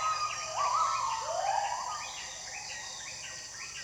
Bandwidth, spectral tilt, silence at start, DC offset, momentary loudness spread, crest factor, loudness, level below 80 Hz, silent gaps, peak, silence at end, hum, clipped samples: 20 kHz; 0.5 dB/octave; 0 s; under 0.1%; 11 LU; 16 dB; -34 LUFS; -66 dBFS; none; -18 dBFS; 0 s; none; under 0.1%